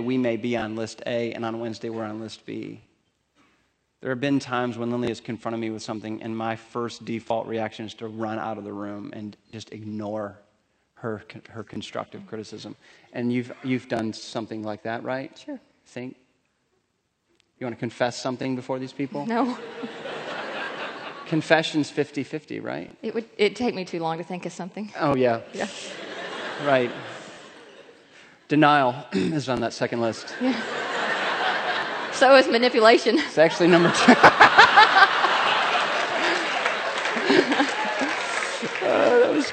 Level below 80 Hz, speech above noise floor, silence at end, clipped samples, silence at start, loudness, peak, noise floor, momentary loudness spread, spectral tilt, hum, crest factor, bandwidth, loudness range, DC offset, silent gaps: -66 dBFS; 49 dB; 0 s; under 0.1%; 0 s; -23 LUFS; 0 dBFS; -73 dBFS; 20 LU; -4.5 dB/octave; none; 24 dB; 9 kHz; 18 LU; under 0.1%; none